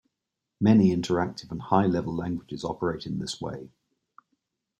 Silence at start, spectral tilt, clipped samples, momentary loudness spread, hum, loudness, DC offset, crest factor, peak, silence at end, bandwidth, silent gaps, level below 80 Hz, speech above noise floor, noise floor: 0.6 s; -7 dB/octave; under 0.1%; 14 LU; none; -26 LUFS; under 0.1%; 20 dB; -8 dBFS; 1.15 s; 9.4 kHz; none; -58 dBFS; 59 dB; -85 dBFS